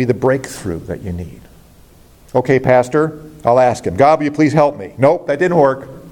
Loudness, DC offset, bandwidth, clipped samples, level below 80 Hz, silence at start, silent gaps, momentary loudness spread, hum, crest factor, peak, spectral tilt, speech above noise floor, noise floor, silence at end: -15 LUFS; under 0.1%; 17 kHz; under 0.1%; -46 dBFS; 0 s; none; 13 LU; none; 14 dB; 0 dBFS; -7 dB/octave; 30 dB; -44 dBFS; 0 s